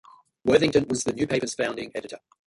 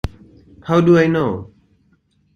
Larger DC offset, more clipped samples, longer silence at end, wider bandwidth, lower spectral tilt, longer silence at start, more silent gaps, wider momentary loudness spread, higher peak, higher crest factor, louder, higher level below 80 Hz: neither; neither; second, 0.3 s vs 0.9 s; first, 11.5 kHz vs 7 kHz; second, -4.5 dB/octave vs -8 dB/octave; first, 0.45 s vs 0.05 s; neither; second, 15 LU vs 18 LU; second, -6 dBFS vs -2 dBFS; about the same, 20 dB vs 18 dB; second, -25 LUFS vs -15 LUFS; second, -56 dBFS vs -40 dBFS